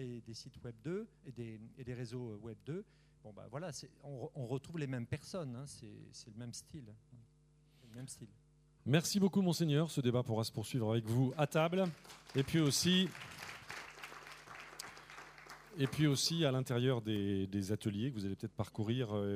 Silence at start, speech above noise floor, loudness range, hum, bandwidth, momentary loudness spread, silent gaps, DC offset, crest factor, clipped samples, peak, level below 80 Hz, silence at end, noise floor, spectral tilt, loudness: 0 s; 31 dB; 13 LU; none; 15.5 kHz; 19 LU; none; under 0.1%; 22 dB; under 0.1%; -16 dBFS; -70 dBFS; 0 s; -68 dBFS; -5 dB/octave; -37 LUFS